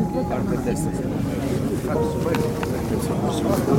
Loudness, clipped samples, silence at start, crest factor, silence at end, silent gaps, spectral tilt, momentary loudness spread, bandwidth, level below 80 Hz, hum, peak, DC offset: -24 LUFS; under 0.1%; 0 s; 16 dB; 0 s; none; -7 dB/octave; 3 LU; 16.5 kHz; -38 dBFS; none; -6 dBFS; under 0.1%